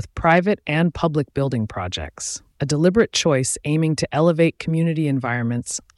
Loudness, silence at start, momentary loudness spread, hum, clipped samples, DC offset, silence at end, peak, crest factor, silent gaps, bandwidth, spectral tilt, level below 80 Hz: -20 LUFS; 0 s; 10 LU; none; under 0.1%; under 0.1%; 0.15 s; -4 dBFS; 16 dB; none; 12 kHz; -5 dB/octave; -44 dBFS